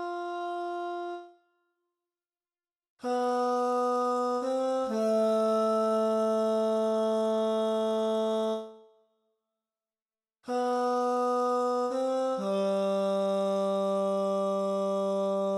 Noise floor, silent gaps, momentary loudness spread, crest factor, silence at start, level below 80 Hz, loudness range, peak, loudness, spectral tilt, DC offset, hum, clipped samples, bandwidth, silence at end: under -90 dBFS; 2.90-2.97 s, 10.02-10.06 s; 8 LU; 10 dB; 0 s; -76 dBFS; 6 LU; -20 dBFS; -29 LUFS; -6 dB/octave; under 0.1%; none; under 0.1%; 14 kHz; 0 s